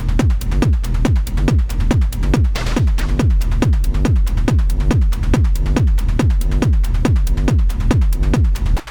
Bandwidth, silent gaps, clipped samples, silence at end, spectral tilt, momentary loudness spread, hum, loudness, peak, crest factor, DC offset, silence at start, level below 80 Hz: 19 kHz; none; under 0.1%; 0 s; -7 dB/octave; 1 LU; none; -17 LUFS; -4 dBFS; 10 dB; under 0.1%; 0 s; -16 dBFS